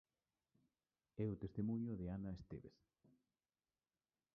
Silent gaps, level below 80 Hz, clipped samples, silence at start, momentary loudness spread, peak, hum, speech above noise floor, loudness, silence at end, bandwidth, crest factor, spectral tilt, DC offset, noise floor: none; -68 dBFS; under 0.1%; 1.15 s; 14 LU; -32 dBFS; none; over 44 dB; -47 LUFS; 1.65 s; 6 kHz; 18 dB; -10.5 dB/octave; under 0.1%; under -90 dBFS